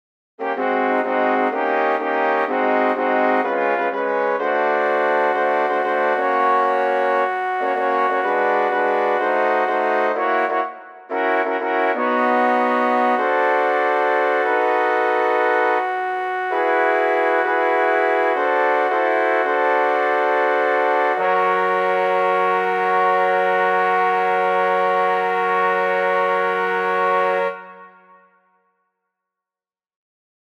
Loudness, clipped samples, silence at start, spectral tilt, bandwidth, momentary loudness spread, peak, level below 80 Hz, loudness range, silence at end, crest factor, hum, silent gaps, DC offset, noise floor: -18 LUFS; under 0.1%; 0.4 s; -5.5 dB/octave; 9.2 kHz; 3 LU; -6 dBFS; -76 dBFS; 2 LU; 2.65 s; 14 dB; none; none; under 0.1%; under -90 dBFS